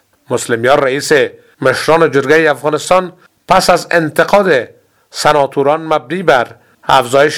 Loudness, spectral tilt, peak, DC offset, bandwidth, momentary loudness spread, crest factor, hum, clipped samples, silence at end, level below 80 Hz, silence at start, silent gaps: -12 LUFS; -4 dB/octave; 0 dBFS; 0.3%; 17 kHz; 9 LU; 12 dB; none; 0.4%; 0 s; -46 dBFS; 0.3 s; none